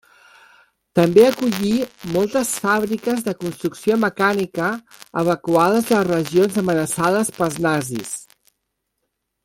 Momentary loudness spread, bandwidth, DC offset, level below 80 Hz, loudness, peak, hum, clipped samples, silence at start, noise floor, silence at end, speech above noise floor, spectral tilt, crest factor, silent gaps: 10 LU; 17 kHz; under 0.1%; -56 dBFS; -19 LUFS; -2 dBFS; none; under 0.1%; 0.95 s; -76 dBFS; 1.2 s; 57 dB; -5 dB/octave; 18 dB; none